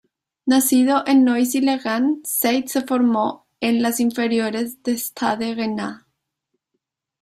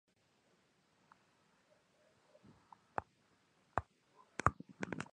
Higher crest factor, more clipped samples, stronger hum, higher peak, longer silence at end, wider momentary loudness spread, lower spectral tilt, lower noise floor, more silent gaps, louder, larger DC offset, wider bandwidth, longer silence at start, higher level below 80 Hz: second, 16 dB vs 36 dB; neither; neither; first, -4 dBFS vs -12 dBFS; first, 1.25 s vs 0.1 s; about the same, 9 LU vs 11 LU; second, -3.5 dB/octave vs -5.5 dB/octave; about the same, -78 dBFS vs -75 dBFS; neither; first, -20 LUFS vs -43 LUFS; neither; first, 16 kHz vs 10 kHz; second, 0.45 s vs 3 s; about the same, -66 dBFS vs -62 dBFS